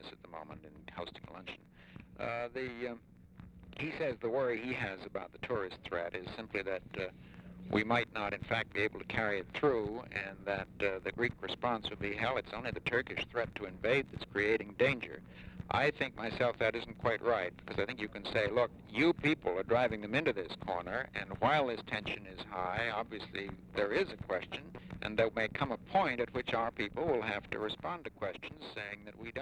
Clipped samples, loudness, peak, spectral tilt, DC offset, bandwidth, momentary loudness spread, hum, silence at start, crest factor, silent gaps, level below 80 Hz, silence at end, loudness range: under 0.1%; -36 LUFS; -16 dBFS; -6 dB/octave; under 0.1%; 11 kHz; 14 LU; none; 0 s; 20 dB; none; -60 dBFS; 0 s; 5 LU